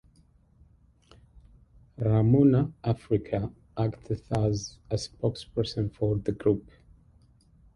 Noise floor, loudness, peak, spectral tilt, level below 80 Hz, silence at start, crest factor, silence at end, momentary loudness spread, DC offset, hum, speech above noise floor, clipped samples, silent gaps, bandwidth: -61 dBFS; -28 LUFS; -10 dBFS; -8 dB/octave; -50 dBFS; 2 s; 18 dB; 1.15 s; 12 LU; under 0.1%; none; 35 dB; under 0.1%; none; 11 kHz